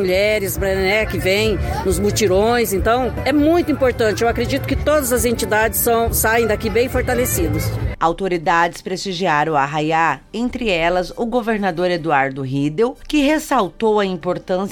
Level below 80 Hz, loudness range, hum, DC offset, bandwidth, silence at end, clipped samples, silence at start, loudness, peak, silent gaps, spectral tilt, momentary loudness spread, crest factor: -32 dBFS; 2 LU; none; under 0.1%; 17.5 kHz; 0 s; under 0.1%; 0 s; -18 LUFS; -2 dBFS; none; -4.5 dB/octave; 5 LU; 16 dB